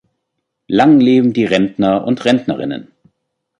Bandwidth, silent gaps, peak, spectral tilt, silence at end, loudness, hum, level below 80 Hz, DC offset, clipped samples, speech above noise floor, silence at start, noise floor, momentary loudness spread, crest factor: 8.8 kHz; none; -2 dBFS; -7 dB/octave; 0.75 s; -13 LUFS; none; -54 dBFS; under 0.1%; under 0.1%; 61 dB; 0.7 s; -74 dBFS; 12 LU; 14 dB